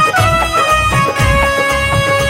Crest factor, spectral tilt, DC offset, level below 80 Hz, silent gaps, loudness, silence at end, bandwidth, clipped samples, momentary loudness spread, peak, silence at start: 12 dB; -4 dB/octave; under 0.1%; -24 dBFS; none; -12 LUFS; 0 s; 16.5 kHz; under 0.1%; 2 LU; 0 dBFS; 0 s